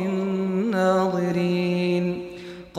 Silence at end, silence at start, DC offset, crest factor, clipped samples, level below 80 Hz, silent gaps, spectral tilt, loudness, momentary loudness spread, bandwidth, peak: 0 s; 0 s; under 0.1%; 12 dB; under 0.1%; -60 dBFS; none; -7.5 dB/octave; -23 LUFS; 11 LU; 13.5 kHz; -10 dBFS